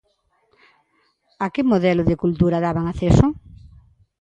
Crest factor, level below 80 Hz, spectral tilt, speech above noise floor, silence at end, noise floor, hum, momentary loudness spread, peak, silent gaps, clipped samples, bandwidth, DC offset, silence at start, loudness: 20 dB; -36 dBFS; -8 dB/octave; 48 dB; 0.55 s; -66 dBFS; none; 9 LU; 0 dBFS; none; under 0.1%; 8.8 kHz; under 0.1%; 1.4 s; -19 LUFS